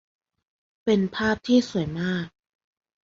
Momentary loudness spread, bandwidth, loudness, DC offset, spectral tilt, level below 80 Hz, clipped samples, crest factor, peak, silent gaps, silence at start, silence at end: 10 LU; 7.6 kHz; -24 LUFS; under 0.1%; -6 dB/octave; -54 dBFS; under 0.1%; 18 dB; -8 dBFS; none; 0.85 s; 0.75 s